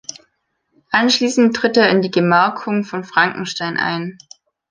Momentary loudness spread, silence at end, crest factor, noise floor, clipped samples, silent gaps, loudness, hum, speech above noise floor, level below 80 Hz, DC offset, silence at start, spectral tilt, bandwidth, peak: 9 LU; 0.6 s; 16 dB; -68 dBFS; under 0.1%; none; -16 LUFS; none; 52 dB; -62 dBFS; under 0.1%; 0.9 s; -4.5 dB/octave; 10 kHz; -2 dBFS